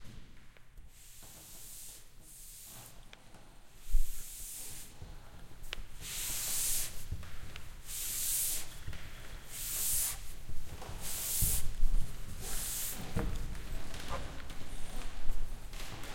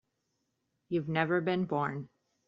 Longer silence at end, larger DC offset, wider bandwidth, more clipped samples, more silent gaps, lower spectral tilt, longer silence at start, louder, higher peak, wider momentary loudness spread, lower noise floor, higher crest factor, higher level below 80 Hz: second, 0 s vs 0.4 s; neither; first, 16.5 kHz vs 5.4 kHz; neither; neither; second, -2 dB/octave vs -5.5 dB/octave; second, 0 s vs 0.9 s; second, -38 LUFS vs -32 LUFS; about the same, -14 dBFS vs -12 dBFS; first, 21 LU vs 11 LU; second, -53 dBFS vs -81 dBFS; about the same, 18 dB vs 22 dB; first, -40 dBFS vs -72 dBFS